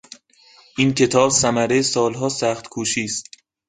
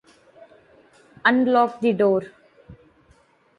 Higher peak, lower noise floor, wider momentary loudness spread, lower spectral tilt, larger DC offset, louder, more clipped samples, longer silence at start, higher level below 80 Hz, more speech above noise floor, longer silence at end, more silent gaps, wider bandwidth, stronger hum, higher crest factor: about the same, -2 dBFS vs -4 dBFS; second, -52 dBFS vs -58 dBFS; first, 10 LU vs 7 LU; second, -3.5 dB/octave vs -7 dB/octave; neither; about the same, -19 LUFS vs -20 LUFS; neither; second, 0.75 s vs 1.25 s; first, -54 dBFS vs -64 dBFS; second, 33 dB vs 39 dB; second, 0.45 s vs 0.85 s; neither; about the same, 9.6 kHz vs 9.2 kHz; neither; about the same, 20 dB vs 20 dB